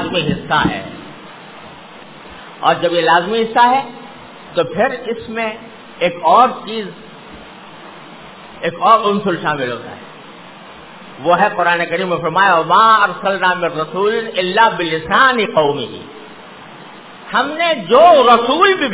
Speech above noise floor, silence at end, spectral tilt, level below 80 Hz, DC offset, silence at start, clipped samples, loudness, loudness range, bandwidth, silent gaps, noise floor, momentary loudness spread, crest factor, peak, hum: 23 dB; 0 s; -8.5 dB/octave; -50 dBFS; 0.3%; 0 s; under 0.1%; -14 LUFS; 5 LU; 4 kHz; none; -37 dBFS; 25 LU; 16 dB; 0 dBFS; none